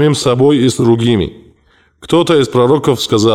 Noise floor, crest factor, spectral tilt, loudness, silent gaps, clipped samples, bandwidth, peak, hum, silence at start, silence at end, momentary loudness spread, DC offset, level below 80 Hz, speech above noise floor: -51 dBFS; 10 dB; -6 dB/octave; -12 LUFS; none; under 0.1%; 15.5 kHz; -2 dBFS; none; 0 s; 0 s; 4 LU; under 0.1%; -42 dBFS; 41 dB